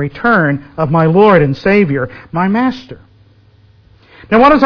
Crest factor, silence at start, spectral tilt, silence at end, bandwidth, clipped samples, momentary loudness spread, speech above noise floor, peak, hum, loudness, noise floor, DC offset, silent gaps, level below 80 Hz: 12 dB; 0 s; -9 dB/octave; 0 s; 5.4 kHz; 0.5%; 10 LU; 35 dB; 0 dBFS; none; -12 LUFS; -46 dBFS; under 0.1%; none; -40 dBFS